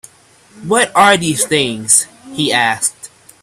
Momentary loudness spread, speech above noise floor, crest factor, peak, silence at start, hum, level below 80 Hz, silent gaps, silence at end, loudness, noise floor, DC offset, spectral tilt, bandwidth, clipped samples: 9 LU; 29 dB; 16 dB; 0 dBFS; 0.55 s; none; -54 dBFS; none; 0.35 s; -13 LUFS; -43 dBFS; under 0.1%; -2 dB/octave; 16 kHz; under 0.1%